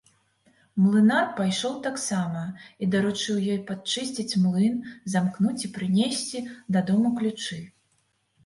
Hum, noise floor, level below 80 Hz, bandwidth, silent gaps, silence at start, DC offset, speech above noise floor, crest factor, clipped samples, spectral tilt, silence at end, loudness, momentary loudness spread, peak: none; -70 dBFS; -68 dBFS; 11.5 kHz; none; 0.75 s; under 0.1%; 45 dB; 16 dB; under 0.1%; -5 dB/octave; 0.75 s; -25 LUFS; 11 LU; -10 dBFS